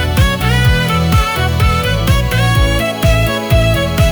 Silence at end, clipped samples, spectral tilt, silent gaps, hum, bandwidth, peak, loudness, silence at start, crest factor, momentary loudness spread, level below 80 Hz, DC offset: 0 s; under 0.1%; -5.5 dB/octave; none; none; over 20 kHz; 0 dBFS; -13 LUFS; 0 s; 10 dB; 2 LU; -18 dBFS; under 0.1%